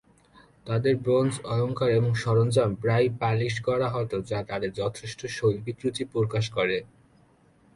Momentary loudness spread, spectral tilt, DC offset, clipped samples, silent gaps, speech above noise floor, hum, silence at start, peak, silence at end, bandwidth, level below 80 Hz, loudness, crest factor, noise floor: 8 LU; -6.5 dB/octave; under 0.1%; under 0.1%; none; 34 dB; none; 0.65 s; -10 dBFS; 0.9 s; 11.5 kHz; -56 dBFS; -26 LUFS; 16 dB; -60 dBFS